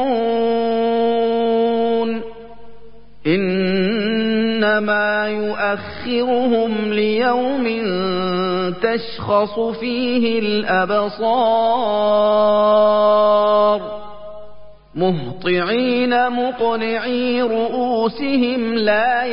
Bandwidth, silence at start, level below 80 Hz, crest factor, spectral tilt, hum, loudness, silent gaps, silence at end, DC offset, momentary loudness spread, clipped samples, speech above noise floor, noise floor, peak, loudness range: 5.4 kHz; 0 s; -52 dBFS; 14 dB; -11 dB/octave; none; -18 LUFS; none; 0 s; 2%; 7 LU; under 0.1%; 27 dB; -44 dBFS; -4 dBFS; 4 LU